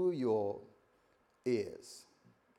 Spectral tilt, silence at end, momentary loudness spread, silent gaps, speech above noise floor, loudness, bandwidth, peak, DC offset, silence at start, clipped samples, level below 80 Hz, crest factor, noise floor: -6.5 dB/octave; 0.55 s; 19 LU; none; 36 dB; -37 LUFS; 12 kHz; -22 dBFS; under 0.1%; 0 s; under 0.1%; -82 dBFS; 16 dB; -72 dBFS